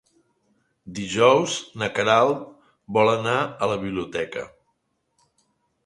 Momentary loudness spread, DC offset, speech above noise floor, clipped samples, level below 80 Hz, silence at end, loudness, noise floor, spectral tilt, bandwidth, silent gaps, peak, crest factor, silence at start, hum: 16 LU; under 0.1%; 51 dB; under 0.1%; -60 dBFS; 1.4 s; -22 LUFS; -72 dBFS; -4.5 dB/octave; 11.5 kHz; none; -4 dBFS; 22 dB; 0.85 s; none